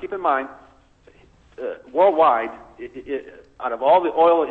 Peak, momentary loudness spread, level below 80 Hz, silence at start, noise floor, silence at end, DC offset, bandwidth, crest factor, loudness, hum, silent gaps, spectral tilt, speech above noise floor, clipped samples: -6 dBFS; 20 LU; -58 dBFS; 0 s; -53 dBFS; 0 s; under 0.1%; 4.3 kHz; 16 dB; -19 LUFS; none; none; -6.5 dB/octave; 33 dB; under 0.1%